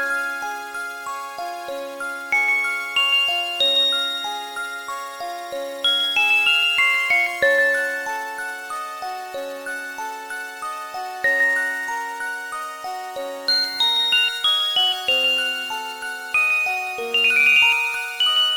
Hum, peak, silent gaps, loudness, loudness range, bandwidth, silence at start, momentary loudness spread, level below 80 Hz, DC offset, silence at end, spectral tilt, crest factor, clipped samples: none; -6 dBFS; none; -19 LUFS; 6 LU; 18 kHz; 0 s; 15 LU; -66 dBFS; under 0.1%; 0 s; 1 dB/octave; 16 dB; under 0.1%